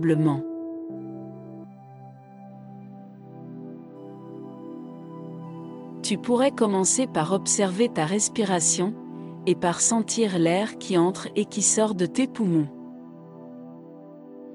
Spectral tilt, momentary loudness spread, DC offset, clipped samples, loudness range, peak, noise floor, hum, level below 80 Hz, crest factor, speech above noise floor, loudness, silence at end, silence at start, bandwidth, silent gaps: -4 dB/octave; 23 LU; under 0.1%; under 0.1%; 19 LU; -10 dBFS; -45 dBFS; none; -70 dBFS; 18 dB; 22 dB; -23 LUFS; 0 s; 0 s; 12 kHz; none